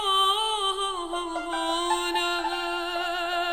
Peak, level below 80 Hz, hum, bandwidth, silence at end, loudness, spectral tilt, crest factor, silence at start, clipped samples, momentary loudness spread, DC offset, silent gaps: -12 dBFS; -52 dBFS; none; 17 kHz; 0 s; -26 LUFS; -0.5 dB/octave; 16 dB; 0 s; under 0.1%; 8 LU; under 0.1%; none